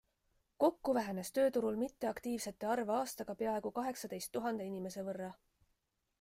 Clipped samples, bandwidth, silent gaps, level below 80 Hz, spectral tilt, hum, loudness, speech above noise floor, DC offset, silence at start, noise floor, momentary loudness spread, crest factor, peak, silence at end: under 0.1%; 16 kHz; none; -72 dBFS; -5 dB/octave; none; -38 LUFS; 45 dB; under 0.1%; 0.6 s; -82 dBFS; 9 LU; 20 dB; -18 dBFS; 0.9 s